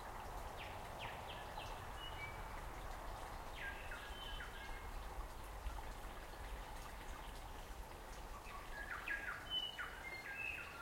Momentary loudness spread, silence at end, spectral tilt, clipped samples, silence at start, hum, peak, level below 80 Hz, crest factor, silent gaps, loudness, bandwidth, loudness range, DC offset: 9 LU; 0 s; -3 dB/octave; under 0.1%; 0 s; none; -32 dBFS; -54 dBFS; 16 dB; none; -49 LUFS; 16.5 kHz; 5 LU; under 0.1%